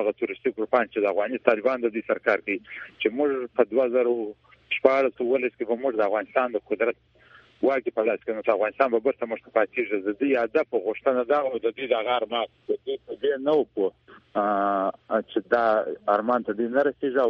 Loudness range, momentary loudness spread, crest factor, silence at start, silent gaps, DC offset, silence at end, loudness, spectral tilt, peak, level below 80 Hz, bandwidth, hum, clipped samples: 2 LU; 6 LU; 24 dB; 0 s; none; under 0.1%; 0 s; -25 LUFS; -7 dB/octave; -2 dBFS; -68 dBFS; 6.2 kHz; none; under 0.1%